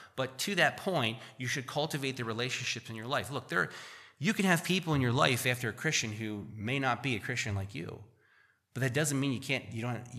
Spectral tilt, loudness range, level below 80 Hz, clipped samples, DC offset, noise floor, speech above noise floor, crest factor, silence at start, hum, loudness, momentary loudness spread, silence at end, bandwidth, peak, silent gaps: -4 dB/octave; 4 LU; -68 dBFS; under 0.1%; under 0.1%; -67 dBFS; 35 dB; 24 dB; 0 s; none; -32 LUFS; 11 LU; 0 s; 15 kHz; -10 dBFS; none